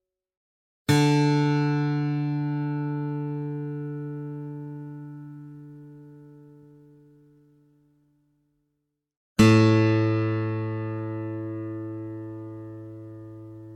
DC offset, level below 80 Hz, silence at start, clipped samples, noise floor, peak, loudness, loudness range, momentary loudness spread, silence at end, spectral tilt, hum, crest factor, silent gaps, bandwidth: under 0.1%; -58 dBFS; 0.9 s; under 0.1%; -79 dBFS; -4 dBFS; -25 LUFS; 17 LU; 22 LU; 0 s; -7 dB/octave; none; 22 dB; 9.17-9.36 s; 13.5 kHz